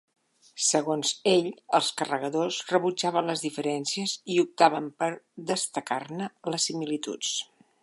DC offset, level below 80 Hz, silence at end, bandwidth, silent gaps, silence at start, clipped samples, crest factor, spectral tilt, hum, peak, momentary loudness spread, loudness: under 0.1%; -82 dBFS; 0.4 s; 11.5 kHz; none; 0.55 s; under 0.1%; 24 dB; -3 dB/octave; none; -4 dBFS; 9 LU; -27 LUFS